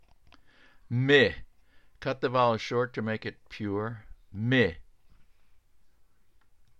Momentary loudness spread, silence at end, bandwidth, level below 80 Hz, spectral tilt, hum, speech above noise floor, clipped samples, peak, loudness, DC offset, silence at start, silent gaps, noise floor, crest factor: 17 LU; 2 s; 8 kHz; -56 dBFS; -6.5 dB/octave; none; 38 dB; under 0.1%; -8 dBFS; -28 LUFS; 0.1%; 0.9 s; none; -65 dBFS; 22 dB